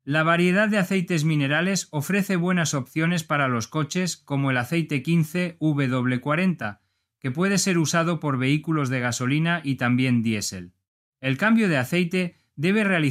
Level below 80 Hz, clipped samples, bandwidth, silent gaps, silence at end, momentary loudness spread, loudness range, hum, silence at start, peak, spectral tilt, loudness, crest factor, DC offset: -66 dBFS; under 0.1%; 15.5 kHz; 10.88-11.12 s; 0 s; 6 LU; 2 LU; none; 0.05 s; -6 dBFS; -5 dB/octave; -23 LUFS; 16 dB; under 0.1%